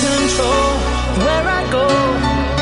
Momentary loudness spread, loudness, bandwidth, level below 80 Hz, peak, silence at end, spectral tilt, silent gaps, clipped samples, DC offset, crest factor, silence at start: 2 LU; -16 LUFS; 11 kHz; -24 dBFS; -2 dBFS; 0 s; -4.5 dB/octave; none; under 0.1%; under 0.1%; 12 dB; 0 s